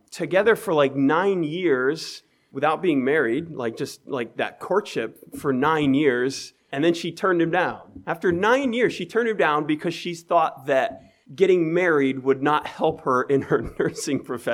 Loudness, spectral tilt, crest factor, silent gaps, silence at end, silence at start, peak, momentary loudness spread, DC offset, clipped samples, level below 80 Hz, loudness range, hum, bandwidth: -23 LUFS; -5.5 dB/octave; 18 dB; none; 0 s; 0.1 s; -6 dBFS; 10 LU; under 0.1%; under 0.1%; -58 dBFS; 3 LU; none; 15.5 kHz